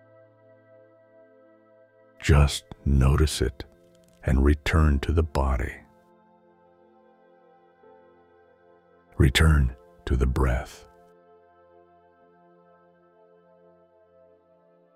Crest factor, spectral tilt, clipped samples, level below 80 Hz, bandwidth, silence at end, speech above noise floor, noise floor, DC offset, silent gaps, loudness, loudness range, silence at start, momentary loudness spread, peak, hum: 20 dB; -6 dB/octave; under 0.1%; -30 dBFS; 14.5 kHz; 4.2 s; 38 dB; -60 dBFS; under 0.1%; none; -24 LUFS; 8 LU; 2.2 s; 21 LU; -6 dBFS; none